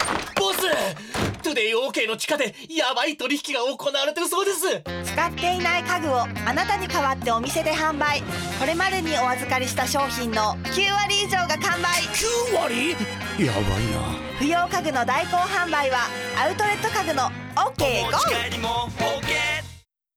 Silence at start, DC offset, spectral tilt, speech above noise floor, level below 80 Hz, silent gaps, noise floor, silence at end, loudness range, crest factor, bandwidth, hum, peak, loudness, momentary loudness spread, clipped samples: 0 s; under 0.1%; -3 dB/octave; 23 dB; -44 dBFS; none; -46 dBFS; 0.35 s; 2 LU; 14 dB; over 20 kHz; none; -10 dBFS; -23 LUFS; 4 LU; under 0.1%